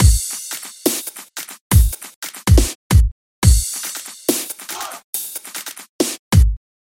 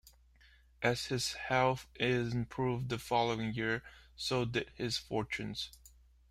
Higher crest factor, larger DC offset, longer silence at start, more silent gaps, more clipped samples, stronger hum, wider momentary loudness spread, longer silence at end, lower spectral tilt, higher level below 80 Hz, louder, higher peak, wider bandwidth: about the same, 18 dB vs 20 dB; neither; about the same, 0 s vs 0.05 s; first, 1.61-1.70 s, 2.16-2.22 s, 2.75-2.90 s, 3.12-3.42 s, 5.04-5.13 s, 5.89-5.99 s, 6.19-6.31 s vs none; neither; neither; first, 14 LU vs 8 LU; second, 0.25 s vs 0.45 s; about the same, -4.5 dB/octave vs -4.5 dB/octave; first, -20 dBFS vs -60 dBFS; first, -19 LUFS vs -35 LUFS; first, 0 dBFS vs -16 dBFS; about the same, 17 kHz vs 16 kHz